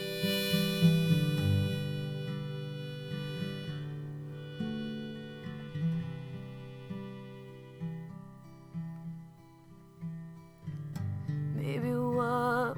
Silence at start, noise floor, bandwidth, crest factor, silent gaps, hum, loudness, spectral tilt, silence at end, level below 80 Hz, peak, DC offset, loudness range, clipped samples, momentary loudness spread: 0 s; -55 dBFS; 17.5 kHz; 20 dB; none; none; -34 LUFS; -6.5 dB/octave; 0 s; -66 dBFS; -14 dBFS; under 0.1%; 14 LU; under 0.1%; 18 LU